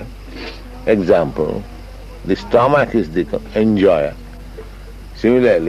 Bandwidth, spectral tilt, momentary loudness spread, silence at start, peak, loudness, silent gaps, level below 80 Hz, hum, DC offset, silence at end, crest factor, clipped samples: 14 kHz; -7.5 dB/octave; 22 LU; 0 s; -2 dBFS; -16 LUFS; none; -34 dBFS; none; under 0.1%; 0 s; 16 dB; under 0.1%